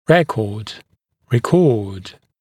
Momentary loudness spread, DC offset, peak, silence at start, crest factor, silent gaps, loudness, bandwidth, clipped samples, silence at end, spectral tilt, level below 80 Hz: 20 LU; under 0.1%; 0 dBFS; 0.1 s; 18 dB; none; -17 LUFS; 14.5 kHz; under 0.1%; 0.3 s; -7 dB/octave; -54 dBFS